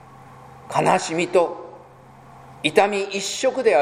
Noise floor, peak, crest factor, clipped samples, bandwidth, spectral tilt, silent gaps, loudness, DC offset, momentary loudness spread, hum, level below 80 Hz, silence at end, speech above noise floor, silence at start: -46 dBFS; 0 dBFS; 22 dB; under 0.1%; 15.5 kHz; -3.5 dB/octave; none; -21 LUFS; under 0.1%; 8 LU; none; -62 dBFS; 0 s; 27 dB; 0.2 s